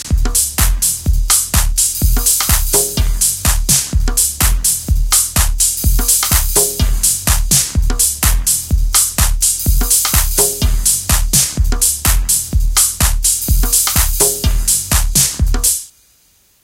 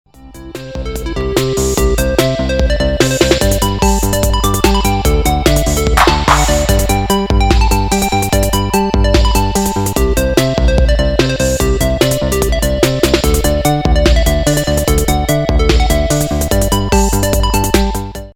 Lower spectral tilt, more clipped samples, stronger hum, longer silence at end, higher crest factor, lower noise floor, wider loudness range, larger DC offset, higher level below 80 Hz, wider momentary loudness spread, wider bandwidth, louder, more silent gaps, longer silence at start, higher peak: second, -2 dB/octave vs -4.5 dB/octave; neither; neither; first, 0.75 s vs 0.05 s; about the same, 14 dB vs 12 dB; first, -53 dBFS vs -32 dBFS; about the same, 1 LU vs 1 LU; neither; about the same, -16 dBFS vs -16 dBFS; about the same, 3 LU vs 3 LU; about the same, 17 kHz vs 18.5 kHz; about the same, -12 LUFS vs -13 LUFS; neither; second, 0 s vs 0.2 s; about the same, 0 dBFS vs 0 dBFS